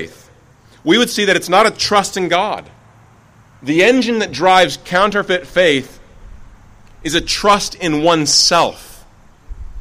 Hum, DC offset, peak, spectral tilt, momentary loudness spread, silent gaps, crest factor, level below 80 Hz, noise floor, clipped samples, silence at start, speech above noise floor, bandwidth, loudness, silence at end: none; 0.2%; 0 dBFS; -3 dB/octave; 8 LU; none; 16 dB; -40 dBFS; -47 dBFS; under 0.1%; 0 s; 33 dB; 16 kHz; -13 LUFS; 0 s